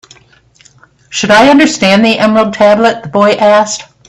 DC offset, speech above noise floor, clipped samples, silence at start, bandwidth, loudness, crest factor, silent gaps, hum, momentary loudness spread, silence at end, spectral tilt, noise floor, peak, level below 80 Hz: under 0.1%; 37 dB; 0.2%; 1.1 s; 12 kHz; -8 LUFS; 10 dB; none; none; 6 LU; 0.25 s; -4 dB/octave; -45 dBFS; 0 dBFS; -46 dBFS